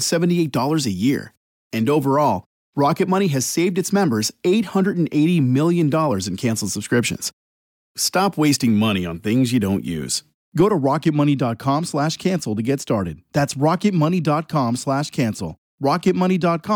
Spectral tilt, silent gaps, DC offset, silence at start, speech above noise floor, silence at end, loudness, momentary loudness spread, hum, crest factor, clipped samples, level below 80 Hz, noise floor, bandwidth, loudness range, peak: -5.5 dB/octave; 1.37-1.70 s, 2.46-2.73 s, 7.33-7.95 s, 10.34-10.52 s, 15.58-15.78 s; under 0.1%; 0 s; over 71 dB; 0 s; -20 LUFS; 6 LU; none; 12 dB; under 0.1%; -56 dBFS; under -90 dBFS; 17.5 kHz; 2 LU; -6 dBFS